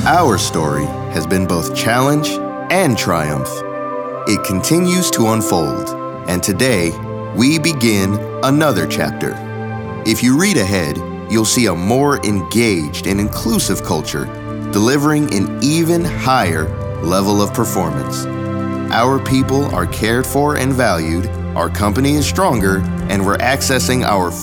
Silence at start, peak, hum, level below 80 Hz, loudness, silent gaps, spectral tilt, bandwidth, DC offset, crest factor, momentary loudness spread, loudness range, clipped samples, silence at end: 0 s; 0 dBFS; none; -38 dBFS; -16 LUFS; none; -5 dB/octave; over 20 kHz; under 0.1%; 14 dB; 8 LU; 1 LU; under 0.1%; 0 s